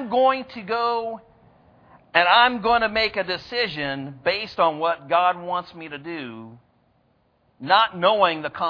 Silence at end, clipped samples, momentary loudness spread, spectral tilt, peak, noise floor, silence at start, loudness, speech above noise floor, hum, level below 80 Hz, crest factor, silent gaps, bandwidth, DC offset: 0 s; under 0.1%; 17 LU; -5.5 dB/octave; 0 dBFS; -64 dBFS; 0 s; -21 LUFS; 42 dB; none; -56 dBFS; 22 dB; none; 5.4 kHz; under 0.1%